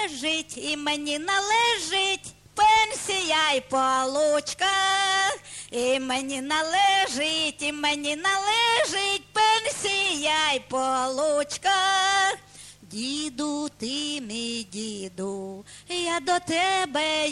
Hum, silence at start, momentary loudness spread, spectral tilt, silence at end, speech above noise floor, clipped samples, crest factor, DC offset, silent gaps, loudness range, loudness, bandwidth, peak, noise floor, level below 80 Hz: none; 0 s; 11 LU; -1 dB/octave; 0 s; 22 dB; under 0.1%; 14 dB; under 0.1%; none; 6 LU; -24 LUFS; 13 kHz; -10 dBFS; -48 dBFS; -60 dBFS